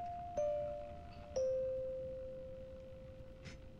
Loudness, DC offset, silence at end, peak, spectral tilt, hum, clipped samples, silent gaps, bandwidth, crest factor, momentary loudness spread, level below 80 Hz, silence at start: -43 LUFS; under 0.1%; 0 s; -28 dBFS; -6 dB/octave; none; under 0.1%; none; 7.4 kHz; 14 dB; 16 LU; -58 dBFS; 0 s